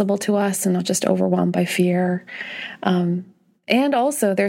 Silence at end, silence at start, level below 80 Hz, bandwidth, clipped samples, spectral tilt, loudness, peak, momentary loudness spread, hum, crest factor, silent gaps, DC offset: 0 s; 0 s; -70 dBFS; 16.5 kHz; under 0.1%; -5 dB/octave; -20 LUFS; -4 dBFS; 9 LU; none; 16 dB; none; under 0.1%